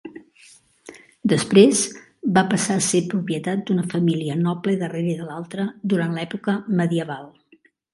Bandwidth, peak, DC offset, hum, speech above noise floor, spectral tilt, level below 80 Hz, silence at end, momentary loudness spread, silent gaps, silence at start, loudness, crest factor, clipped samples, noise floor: 11.5 kHz; 0 dBFS; under 0.1%; none; 37 dB; -5 dB/octave; -64 dBFS; 0.65 s; 12 LU; none; 0.05 s; -21 LUFS; 22 dB; under 0.1%; -57 dBFS